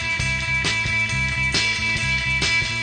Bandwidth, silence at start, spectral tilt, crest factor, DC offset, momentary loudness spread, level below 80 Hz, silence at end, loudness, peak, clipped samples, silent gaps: 10 kHz; 0 s; -2.5 dB/octave; 14 dB; under 0.1%; 2 LU; -36 dBFS; 0 s; -19 LUFS; -6 dBFS; under 0.1%; none